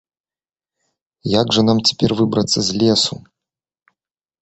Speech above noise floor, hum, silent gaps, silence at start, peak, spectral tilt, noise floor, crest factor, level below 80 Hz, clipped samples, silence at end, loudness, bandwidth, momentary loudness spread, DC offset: over 74 dB; none; none; 1.25 s; -2 dBFS; -4.5 dB/octave; under -90 dBFS; 18 dB; -50 dBFS; under 0.1%; 1.25 s; -16 LUFS; 8.2 kHz; 6 LU; under 0.1%